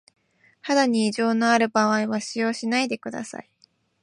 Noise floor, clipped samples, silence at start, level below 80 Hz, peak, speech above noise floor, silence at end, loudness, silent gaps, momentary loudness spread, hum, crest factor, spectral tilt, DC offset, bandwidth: -63 dBFS; under 0.1%; 0.65 s; -74 dBFS; -6 dBFS; 40 dB; 0.6 s; -22 LUFS; none; 15 LU; none; 18 dB; -4 dB/octave; under 0.1%; 11 kHz